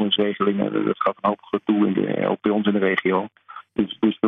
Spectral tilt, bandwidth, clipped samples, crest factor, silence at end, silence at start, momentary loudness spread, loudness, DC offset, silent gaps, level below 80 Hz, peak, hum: -9 dB/octave; 3.9 kHz; under 0.1%; 16 dB; 0 s; 0 s; 6 LU; -22 LUFS; under 0.1%; none; -62 dBFS; -4 dBFS; none